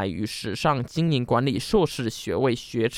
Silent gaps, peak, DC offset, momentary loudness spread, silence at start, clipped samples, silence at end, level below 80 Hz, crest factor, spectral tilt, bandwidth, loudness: none; -8 dBFS; under 0.1%; 6 LU; 0 s; under 0.1%; 0 s; -48 dBFS; 16 dB; -6 dB/octave; 16 kHz; -25 LUFS